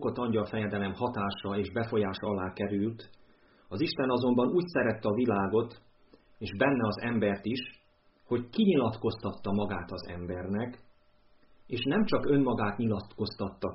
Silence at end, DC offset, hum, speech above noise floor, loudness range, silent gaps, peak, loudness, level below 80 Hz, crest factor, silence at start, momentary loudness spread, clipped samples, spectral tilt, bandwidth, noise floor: 0 s; under 0.1%; none; 34 dB; 4 LU; none; -14 dBFS; -31 LUFS; -58 dBFS; 18 dB; 0 s; 11 LU; under 0.1%; -5.5 dB/octave; 5.8 kHz; -64 dBFS